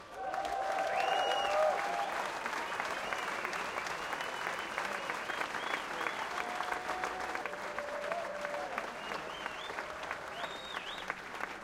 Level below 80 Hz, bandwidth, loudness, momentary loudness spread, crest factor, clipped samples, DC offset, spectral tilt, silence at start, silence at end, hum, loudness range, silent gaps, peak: -68 dBFS; 16.5 kHz; -36 LUFS; 9 LU; 20 dB; under 0.1%; under 0.1%; -2 dB/octave; 0 s; 0 s; none; 6 LU; none; -18 dBFS